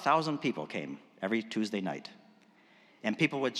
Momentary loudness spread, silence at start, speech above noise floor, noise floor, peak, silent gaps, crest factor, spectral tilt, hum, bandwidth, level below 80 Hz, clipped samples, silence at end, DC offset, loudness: 12 LU; 0 s; 30 dB; -62 dBFS; -12 dBFS; none; 22 dB; -5.5 dB/octave; none; 12.5 kHz; under -90 dBFS; under 0.1%; 0 s; under 0.1%; -34 LUFS